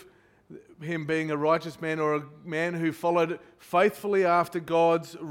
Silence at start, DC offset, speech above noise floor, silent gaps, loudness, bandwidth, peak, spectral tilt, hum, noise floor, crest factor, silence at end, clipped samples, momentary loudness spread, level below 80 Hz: 0 s; under 0.1%; 30 dB; none; -27 LUFS; 17 kHz; -10 dBFS; -6.5 dB/octave; none; -57 dBFS; 18 dB; 0 s; under 0.1%; 9 LU; -70 dBFS